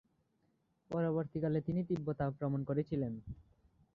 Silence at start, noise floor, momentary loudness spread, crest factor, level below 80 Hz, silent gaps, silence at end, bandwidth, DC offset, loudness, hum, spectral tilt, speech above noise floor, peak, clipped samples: 0.9 s; -78 dBFS; 8 LU; 16 dB; -62 dBFS; none; 0.55 s; 5.6 kHz; under 0.1%; -37 LUFS; none; -9.5 dB/octave; 41 dB; -22 dBFS; under 0.1%